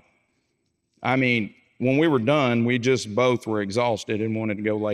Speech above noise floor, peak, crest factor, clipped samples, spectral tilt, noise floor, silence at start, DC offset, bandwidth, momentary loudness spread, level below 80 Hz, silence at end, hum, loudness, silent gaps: 51 dB; -6 dBFS; 18 dB; under 0.1%; -6 dB/octave; -73 dBFS; 1 s; under 0.1%; 12 kHz; 6 LU; -70 dBFS; 0 s; none; -23 LUFS; none